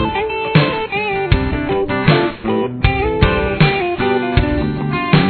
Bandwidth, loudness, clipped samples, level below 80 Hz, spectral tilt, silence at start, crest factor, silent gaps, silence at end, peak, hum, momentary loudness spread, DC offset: 4.6 kHz; -16 LUFS; under 0.1%; -26 dBFS; -10 dB/octave; 0 s; 16 dB; none; 0 s; 0 dBFS; none; 5 LU; under 0.1%